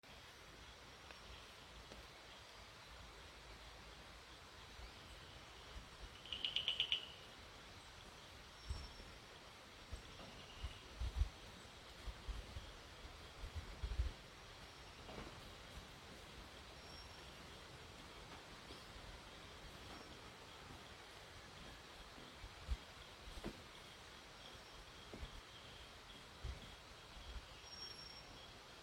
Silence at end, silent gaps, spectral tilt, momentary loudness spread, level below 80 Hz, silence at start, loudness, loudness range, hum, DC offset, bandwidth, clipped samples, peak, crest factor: 0 s; none; -3.5 dB/octave; 10 LU; -56 dBFS; 0.05 s; -52 LUFS; 12 LU; none; under 0.1%; 16.5 kHz; under 0.1%; -22 dBFS; 30 dB